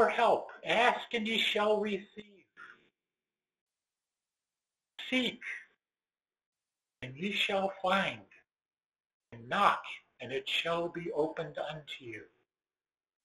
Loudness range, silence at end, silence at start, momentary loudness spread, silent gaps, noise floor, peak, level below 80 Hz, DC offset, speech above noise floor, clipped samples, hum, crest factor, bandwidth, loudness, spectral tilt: 8 LU; 1 s; 0 s; 18 LU; 3.61-3.67 s, 6.46-6.53 s, 8.86-8.90 s, 9.06-9.20 s; under -90 dBFS; -10 dBFS; -74 dBFS; under 0.1%; over 57 dB; under 0.1%; none; 26 dB; 12 kHz; -32 LUFS; -4 dB/octave